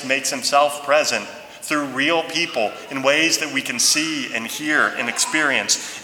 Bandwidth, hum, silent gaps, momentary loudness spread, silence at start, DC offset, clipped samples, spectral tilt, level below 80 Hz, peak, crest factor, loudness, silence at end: 19.5 kHz; none; none; 8 LU; 0 s; under 0.1%; under 0.1%; -1 dB/octave; -68 dBFS; -2 dBFS; 18 dB; -19 LUFS; 0 s